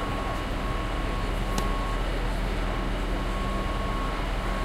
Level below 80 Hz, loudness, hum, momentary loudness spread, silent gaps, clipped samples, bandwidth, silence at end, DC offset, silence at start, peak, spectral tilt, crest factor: -30 dBFS; -30 LUFS; none; 1 LU; none; under 0.1%; 14.5 kHz; 0 s; under 0.1%; 0 s; -10 dBFS; -5.5 dB/octave; 18 dB